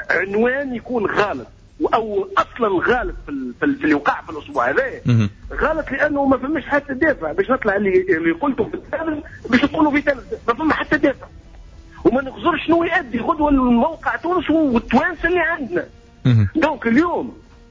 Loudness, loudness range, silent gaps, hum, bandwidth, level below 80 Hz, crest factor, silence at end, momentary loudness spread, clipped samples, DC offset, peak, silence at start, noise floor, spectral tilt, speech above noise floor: -19 LUFS; 2 LU; none; none; 7.6 kHz; -40 dBFS; 14 dB; 0.3 s; 8 LU; under 0.1%; under 0.1%; -4 dBFS; 0 s; -41 dBFS; -7.5 dB/octave; 22 dB